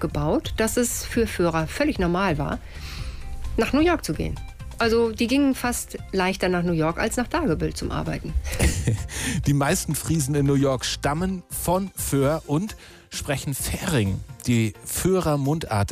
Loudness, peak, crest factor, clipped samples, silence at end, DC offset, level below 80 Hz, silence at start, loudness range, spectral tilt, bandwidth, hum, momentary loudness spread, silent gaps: -24 LUFS; -10 dBFS; 14 dB; under 0.1%; 0 s; under 0.1%; -36 dBFS; 0 s; 2 LU; -5 dB/octave; 15.5 kHz; none; 9 LU; none